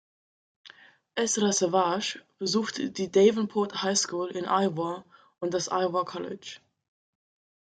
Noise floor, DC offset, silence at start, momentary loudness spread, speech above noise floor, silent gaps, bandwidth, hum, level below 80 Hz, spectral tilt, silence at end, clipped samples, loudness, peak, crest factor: -55 dBFS; under 0.1%; 0.65 s; 14 LU; 28 dB; none; 9.4 kHz; none; -74 dBFS; -3.5 dB/octave; 1.25 s; under 0.1%; -27 LUFS; -8 dBFS; 20 dB